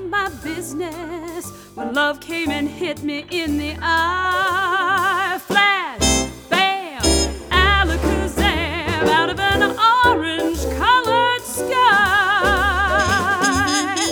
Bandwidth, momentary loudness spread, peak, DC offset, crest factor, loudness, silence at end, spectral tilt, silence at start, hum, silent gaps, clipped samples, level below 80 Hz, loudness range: over 20 kHz; 11 LU; 0 dBFS; under 0.1%; 18 dB; -18 LUFS; 0 s; -3 dB/octave; 0 s; none; none; under 0.1%; -32 dBFS; 6 LU